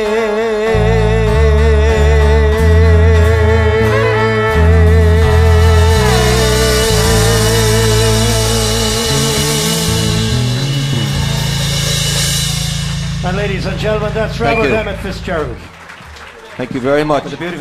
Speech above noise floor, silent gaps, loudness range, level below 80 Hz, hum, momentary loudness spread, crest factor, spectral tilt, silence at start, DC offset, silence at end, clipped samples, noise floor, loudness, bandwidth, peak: 17 dB; none; 7 LU; -18 dBFS; none; 9 LU; 12 dB; -4.5 dB/octave; 0 s; under 0.1%; 0 s; under 0.1%; -33 dBFS; -12 LUFS; 15.5 kHz; 0 dBFS